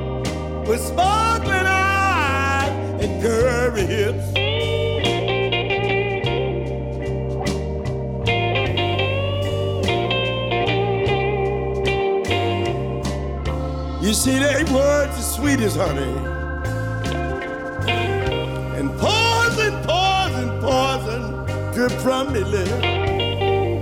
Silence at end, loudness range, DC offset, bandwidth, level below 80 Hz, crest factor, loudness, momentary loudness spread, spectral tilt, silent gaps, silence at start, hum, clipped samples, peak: 0 s; 3 LU; under 0.1%; 17 kHz; -34 dBFS; 12 dB; -20 LUFS; 8 LU; -5 dB/octave; none; 0 s; none; under 0.1%; -8 dBFS